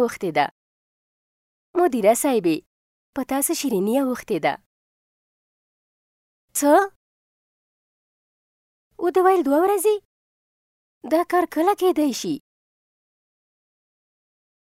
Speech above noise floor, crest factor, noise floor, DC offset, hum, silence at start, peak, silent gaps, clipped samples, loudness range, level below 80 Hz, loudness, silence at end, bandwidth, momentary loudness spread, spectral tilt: over 70 dB; 20 dB; under -90 dBFS; under 0.1%; none; 0 s; -4 dBFS; 0.51-1.74 s, 2.66-3.13 s, 4.66-6.48 s, 6.96-8.91 s, 10.05-11.01 s; under 0.1%; 4 LU; -66 dBFS; -21 LUFS; 2.3 s; 16 kHz; 11 LU; -4 dB/octave